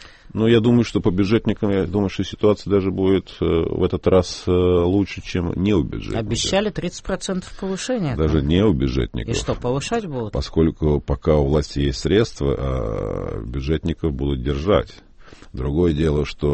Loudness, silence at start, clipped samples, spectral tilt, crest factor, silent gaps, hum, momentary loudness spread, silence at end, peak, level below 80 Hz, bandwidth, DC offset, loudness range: -21 LUFS; 0 s; under 0.1%; -6.5 dB/octave; 16 dB; none; none; 9 LU; 0 s; -4 dBFS; -32 dBFS; 8.8 kHz; under 0.1%; 3 LU